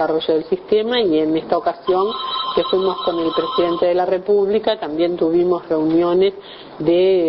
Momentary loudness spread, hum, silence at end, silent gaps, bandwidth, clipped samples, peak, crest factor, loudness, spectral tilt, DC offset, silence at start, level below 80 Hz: 4 LU; none; 0 s; none; 5.6 kHz; under 0.1%; -2 dBFS; 16 dB; -18 LUFS; -9 dB/octave; under 0.1%; 0 s; -54 dBFS